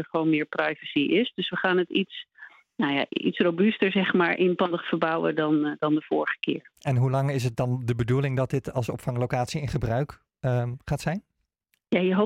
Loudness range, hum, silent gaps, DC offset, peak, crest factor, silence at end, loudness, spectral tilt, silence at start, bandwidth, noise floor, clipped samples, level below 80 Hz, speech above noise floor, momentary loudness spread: 4 LU; none; none; under 0.1%; -8 dBFS; 16 dB; 0 s; -26 LUFS; -7 dB/octave; 0 s; 14 kHz; -75 dBFS; under 0.1%; -54 dBFS; 50 dB; 8 LU